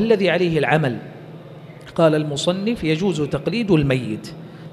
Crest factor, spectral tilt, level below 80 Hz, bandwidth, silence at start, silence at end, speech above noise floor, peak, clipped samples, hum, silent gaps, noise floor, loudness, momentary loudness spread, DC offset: 18 dB; -6.5 dB/octave; -48 dBFS; 12.5 kHz; 0 s; 0 s; 20 dB; -2 dBFS; under 0.1%; none; none; -39 dBFS; -19 LUFS; 21 LU; under 0.1%